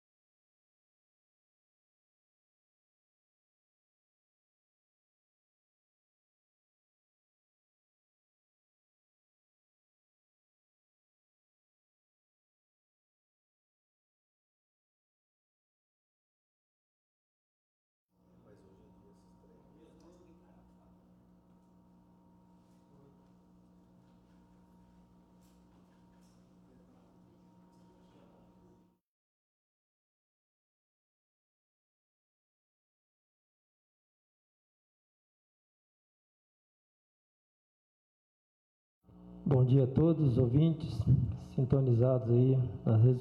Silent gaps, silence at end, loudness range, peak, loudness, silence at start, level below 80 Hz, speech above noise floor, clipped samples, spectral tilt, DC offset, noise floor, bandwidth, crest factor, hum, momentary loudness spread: none; 0 s; 7 LU; -16 dBFS; -29 LUFS; 39.3 s; -62 dBFS; 38 dB; under 0.1%; -11 dB/octave; under 0.1%; -66 dBFS; 5.2 kHz; 22 dB; 60 Hz at -70 dBFS; 8 LU